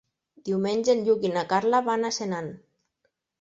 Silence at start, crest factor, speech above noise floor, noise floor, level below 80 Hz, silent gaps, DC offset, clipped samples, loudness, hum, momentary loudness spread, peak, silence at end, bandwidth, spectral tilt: 0.45 s; 18 dB; 51 dB; -76 dBFS; -70 dBFS; none; under 0.1%; under 0.1%; -25 LUFS; none; 10 LU; -10 dBFS; 0.85 s; 8 kHz; -5 dB/octave